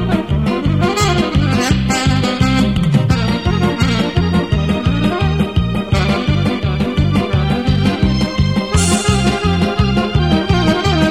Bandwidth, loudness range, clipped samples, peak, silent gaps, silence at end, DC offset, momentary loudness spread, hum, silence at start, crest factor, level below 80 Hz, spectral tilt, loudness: 15 kHz; 1 LU; under 0.1%; -2 dBFS; none; 0 s; 0.7%; 3 LU; none; 0 s; 12 dB; -24 dBFS; -5.5 dB/octave; -15 LUFS